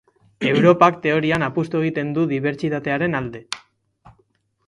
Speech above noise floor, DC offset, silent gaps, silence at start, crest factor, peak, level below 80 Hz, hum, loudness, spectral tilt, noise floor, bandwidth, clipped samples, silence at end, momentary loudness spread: 45 dB; under 0.1%; none; 0.4 s; 20 dB; 0 dBFS; -56 dBFS; none; -19 LUFS; -6.5 dB/octave; -64 dBFS; 11.5 kHz; under 0.1%; 1.1 s; 13 LU